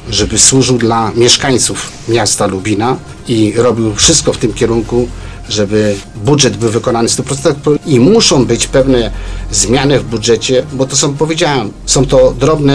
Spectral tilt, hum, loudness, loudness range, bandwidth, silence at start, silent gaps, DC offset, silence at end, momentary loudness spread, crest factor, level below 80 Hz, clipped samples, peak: -4 dB/octave; none; -10 LUFS; 2 LU; 11 kHz; 0 s; none; 0.5%; 0 s; 8 LU; 10 dB; -28 dBFS; 0.3%; 0 dBFS